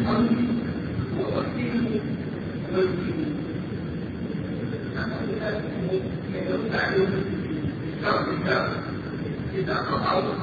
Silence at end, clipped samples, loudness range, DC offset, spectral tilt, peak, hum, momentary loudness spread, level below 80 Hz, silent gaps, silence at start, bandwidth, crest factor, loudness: 0 s; under 0.1%; 3 LU; under 0.1%; -8.5 dB/octave; -8 dBFS; none; 8 LU; -48 dBFS; none; 0 s; 7 kHz; 18 dB; -27 LUFS